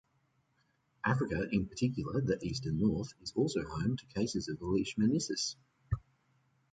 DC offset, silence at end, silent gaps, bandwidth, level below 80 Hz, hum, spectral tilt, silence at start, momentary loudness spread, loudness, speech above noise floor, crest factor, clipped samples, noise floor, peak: under 0.1%; 0.75 s; none; 9.4 kHz; -54 dBFS; none; -5.5 dB/octave; 1.05 s; 7 LU; -35 LUFS; 42 dB; 20 dB; under 0.1%; -75 dBFS; -16 dBFS